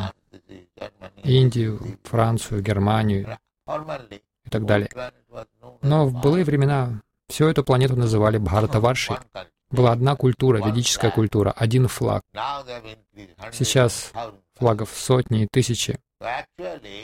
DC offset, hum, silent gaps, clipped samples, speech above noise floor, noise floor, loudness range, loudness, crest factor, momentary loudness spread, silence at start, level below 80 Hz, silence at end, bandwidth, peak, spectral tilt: under 0.1%; none; none; under 0.1%; 26 dB; -47 dBFS; 4 LU; -21 LUFS; 18 dB; 17 LU; 0 s; -46 dBFS; 0 s; 16 kHz; -4 dBFS; -6 dB/octave